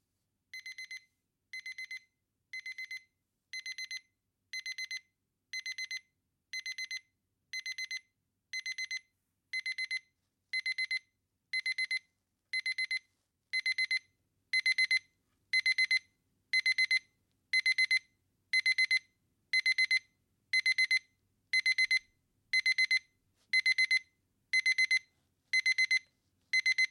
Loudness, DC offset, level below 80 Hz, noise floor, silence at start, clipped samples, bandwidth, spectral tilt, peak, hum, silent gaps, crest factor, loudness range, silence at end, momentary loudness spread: -31 LUFS; under 0.1%; -88 dBFS; -83 dBFS; 0.55 s; under 0.1%; 15 kHz; 5 dB/octave; -18 dBFS; none; none; 16 dB; 13 LU; 0.05 s; 16 LU